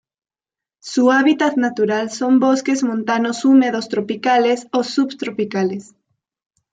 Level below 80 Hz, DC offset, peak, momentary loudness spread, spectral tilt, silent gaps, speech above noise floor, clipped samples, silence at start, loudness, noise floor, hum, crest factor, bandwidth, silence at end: -68 dBFS; under 0.1%; -4 dBFS; 9 LU; -4.5 dB/octave; none; 73 dB; under 0.1%; 0.85 s; -17 LUFS; -89 dBFS; none; 14 dB; 9.2 kHz; 0.9 s